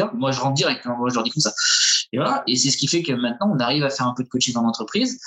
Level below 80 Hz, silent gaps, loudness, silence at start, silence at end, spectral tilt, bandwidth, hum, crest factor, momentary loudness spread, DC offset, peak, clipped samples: -68 dBFS; none; -20 LUFS; 0 s; 0 s; -3 dB/octave; 10 kHz; none; 16 dB; 7 LU; under 0.1%; -6 dBFS; under 0.1%